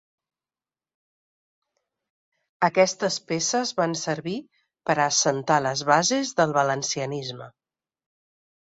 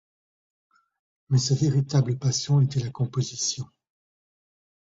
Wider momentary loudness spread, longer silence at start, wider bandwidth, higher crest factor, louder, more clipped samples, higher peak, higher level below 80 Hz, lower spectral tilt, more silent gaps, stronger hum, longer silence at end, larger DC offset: first, 12 LU vs 6 LU; first, 2.6 s vs 1.3 s; about the same, 8.4 kHz vs 7.8 kHz; first, 22 dB vs 16 dB; about the same, -23 LUFS vs -25 LUFS; neither; first, -4 dBFS vs -10 dBFS; second, -68 dBFS vs -60 dBFS; second, -3 dB/octave vs -5.5 dB/octave; neither; neither; about the same, 1.25 s vs 1.2 s; neither